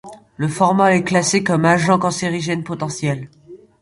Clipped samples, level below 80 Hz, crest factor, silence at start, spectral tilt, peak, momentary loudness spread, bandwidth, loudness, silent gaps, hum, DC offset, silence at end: under 0.1%; -56 dBFS; 16 dB; 0.05 s; -5 dB/octave; -2 dBFS; 10 LU; 11.5 kHz; -17 LUFS; none; none; under 0.1%; 0.25 s